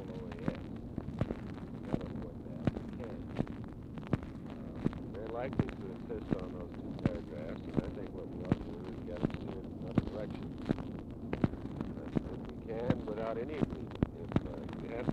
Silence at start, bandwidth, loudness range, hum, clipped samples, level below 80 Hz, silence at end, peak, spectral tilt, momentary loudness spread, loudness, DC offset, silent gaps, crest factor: 0 s; 10 kHz; 3 LU; none; under 0.1%; -50 dBFS; 0 s; -12 dBFS; -9 dB/octave; 8 LU; -39 LUFS; under 0.1%; none; 26 dB